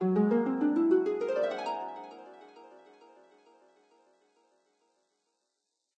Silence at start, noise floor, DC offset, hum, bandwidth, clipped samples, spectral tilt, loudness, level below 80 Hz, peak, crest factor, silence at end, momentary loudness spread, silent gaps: 0 s; -83 dBFS; under 0.1%; none; 8.4 kHz; under 0.1%; -8.5 dB/octave; -29 LUFS; -84 dBFS; -16 dBFS; 18 dB; 3.3 s; 23 LU; none